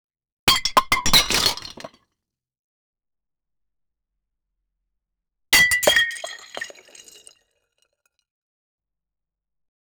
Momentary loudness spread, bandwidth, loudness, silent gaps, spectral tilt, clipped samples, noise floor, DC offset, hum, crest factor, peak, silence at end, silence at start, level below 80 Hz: 19 LU; over 20 kHz; -17 LUFS; 2.59-2.93 s; -0.5 dB/octave; under 0.1%; -87 dBFS; under 0.1%; none; 24 dB; -2 dBFS; 3.3 s; 0.45 s; -44 dBFS